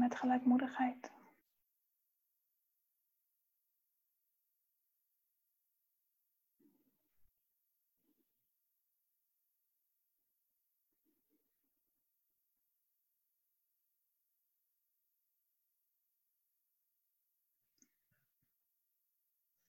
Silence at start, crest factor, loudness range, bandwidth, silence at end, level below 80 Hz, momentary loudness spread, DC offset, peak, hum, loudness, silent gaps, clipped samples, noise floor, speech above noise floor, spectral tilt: 0 s; 24 dB; 10 LU; 16 kHz; 18.6 s; under -90 dBFS; 21 LU; under 0.1%; -22 dBFS; none; -35 LUFS; none; under 0.1%; -84 dBFS; 49 dB; -5.5 dB/octave